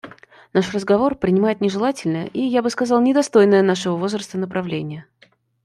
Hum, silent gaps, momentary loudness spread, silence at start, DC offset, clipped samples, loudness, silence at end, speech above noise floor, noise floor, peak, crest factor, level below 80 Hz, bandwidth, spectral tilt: none; none; 10 LU; 0.05 s; under 0.1%; under 0.1%; -19 LUFS; 0.6 s; 38 dB; -57 dBFS; -2 dBFS; 16 dB; -56 dBFS; 12 kHz; -6 dB/octave